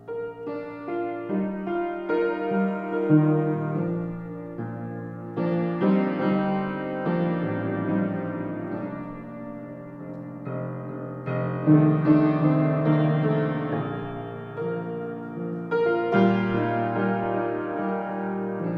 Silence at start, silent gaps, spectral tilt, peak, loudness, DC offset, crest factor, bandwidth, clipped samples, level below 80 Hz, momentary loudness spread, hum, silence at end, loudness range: 0 s; none; -10.5 dB/octave; -6 dBFS; -26 LUFS; under 0.1%; 18 dB; 5.2 kHz; under 0.1%; -60 dBFS; 14 LU; none; 0 s; 7 LU